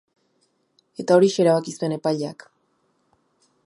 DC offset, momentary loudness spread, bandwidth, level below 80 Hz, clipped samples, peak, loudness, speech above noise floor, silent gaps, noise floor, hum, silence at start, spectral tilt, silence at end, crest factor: under 0.1%; 16 LU; 11.5 kHz; -74 dBFS; under 0.1%; -2 dBFS; -21 LUFS; 48 dB; none; -68 dBFS; none; 1 s; -6 dB/octave; 1.3 s; 20 dB